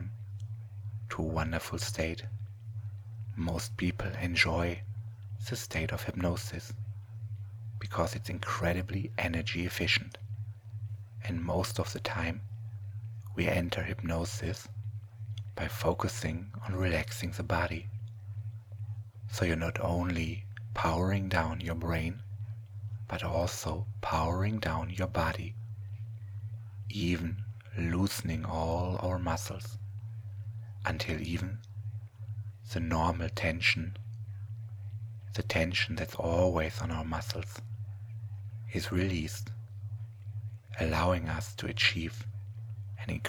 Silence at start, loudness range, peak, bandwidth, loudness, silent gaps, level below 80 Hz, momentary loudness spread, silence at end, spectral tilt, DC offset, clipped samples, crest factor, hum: 0 s; 4 LU; -12 dBFS; 19.5 kHz; -35 LUFS; none; -48 dBFS; 13 LU; 0 s; -5 dB/octave; under 0.1%; under 0.1%; 22 dB; none